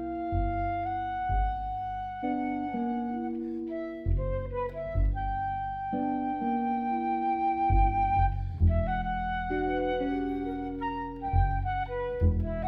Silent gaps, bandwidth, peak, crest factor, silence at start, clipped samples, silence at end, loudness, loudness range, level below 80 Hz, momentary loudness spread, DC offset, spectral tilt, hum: none; 4.7 kHz; -14 dBFS; 16 dB; 0 s; under 0.1%; 0 s; -30 LUFS; 4 LU; -34 dBFS; 7 LU; under 0.1%; -10 dB/octave; none